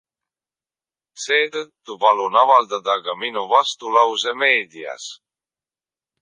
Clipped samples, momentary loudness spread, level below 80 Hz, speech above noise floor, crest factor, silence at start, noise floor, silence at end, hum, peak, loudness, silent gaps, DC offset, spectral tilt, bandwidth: under 0.1%; 16 LU; -78 dBFS; over 71 dB; 20 dB; 1.2 s; under -90 dBFS; 1.05 s; none; -2 dBFS; -18 LUFS; none; under 0.1%; -0.5 dB/octave; 10 kHz